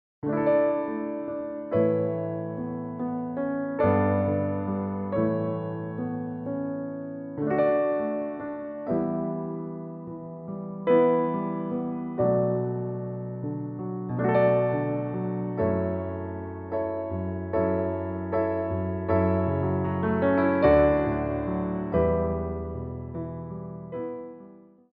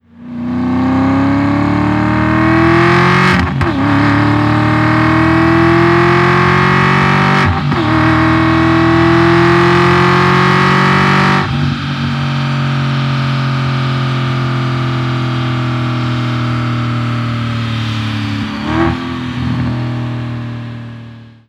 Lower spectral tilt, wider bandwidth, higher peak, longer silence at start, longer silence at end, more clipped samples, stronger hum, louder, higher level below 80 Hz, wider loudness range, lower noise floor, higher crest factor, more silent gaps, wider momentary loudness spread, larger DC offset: first, -8.5 dB/octave vs -7 dB/octave; second, 4.5 kHz vs 10 kHz; second, -8 dBFS vs 0 dBFS; about the same, 0.25 s vs 0.2 s; about the same, 0.3 s vs 0.25 s; neither; neither; second, -27 LUFS vs -12 LUFS; second, -48 dBFS vs -36 dBFS; about the same, 5 LU vs 7 LU; first, -50 dBFS vs -33 dBFS; first, 18 dB vs 12 dB; neither; first, 13 LU vs 9 LU; neither